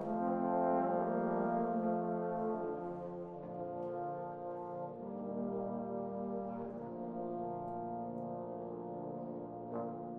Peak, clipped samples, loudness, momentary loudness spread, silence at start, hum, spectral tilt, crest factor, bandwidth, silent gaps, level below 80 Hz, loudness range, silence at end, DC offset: -22 dBFS; under 0.1%; -40 LUFS; 9 LU; 0 s; none; -11.5 dB/octave; 16 dB; 3.6 kHz; none; -72 dBFS; 6 LU; 0 s; under 0.1%